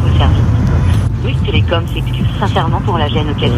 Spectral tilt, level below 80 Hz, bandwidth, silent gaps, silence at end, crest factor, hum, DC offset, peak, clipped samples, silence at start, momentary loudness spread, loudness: -7.5 dB/octave; -20 dBFS; 11 kHz; none; 0 s; 12 dB; none; under 0.1%; 0 dBFS; under 0.1%; 0 s; 4 LU; -14 LUFS